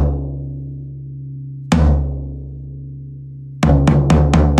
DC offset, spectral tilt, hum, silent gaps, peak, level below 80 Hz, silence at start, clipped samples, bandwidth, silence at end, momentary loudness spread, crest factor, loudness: under 0.1%; -7.5 dB/octave; none; none; -2 dBFS; -22 dBFS; 0 s; under 0.1%; 9.8 kHz; 0 s; 19 LU; 16 dB; -16 LUFS